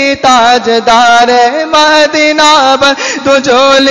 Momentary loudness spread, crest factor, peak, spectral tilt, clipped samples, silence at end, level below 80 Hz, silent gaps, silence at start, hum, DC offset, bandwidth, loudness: 4 LU; 6 dB; 0 dBFS; -1.5 dB/octave; 2%; 0 s; -44 dBFS; none; 0 s; none; 1%; 12 kHz; -6 LUFS